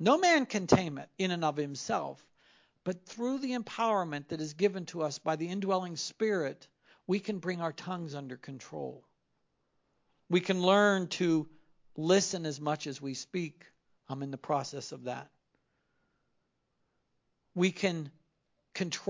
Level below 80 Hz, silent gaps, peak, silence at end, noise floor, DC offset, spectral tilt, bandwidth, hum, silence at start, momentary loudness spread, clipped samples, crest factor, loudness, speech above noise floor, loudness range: -68 dBFS; none; -6 dBFS; 0 s; -79 dBFS; under 0.1%; -4.5 dB/octave; 7.6 kHz; none; 0 s; 15 LU; under 0.1%; 26 dB; -32 LUFS; 47 dB; 10 LU